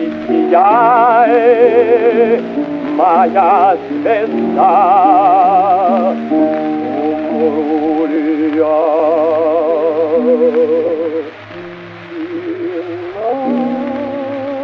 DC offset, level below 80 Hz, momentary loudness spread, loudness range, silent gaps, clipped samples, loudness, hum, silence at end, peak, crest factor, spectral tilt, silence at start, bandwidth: under 0.1%; -58 dBFS; 12 LU; 8 LU; none; under 0.1%; -12 LUFS; none; 0 s; 0 dBFS; 12 dB; -8 dB/octave; 0 s; 5.8 kHz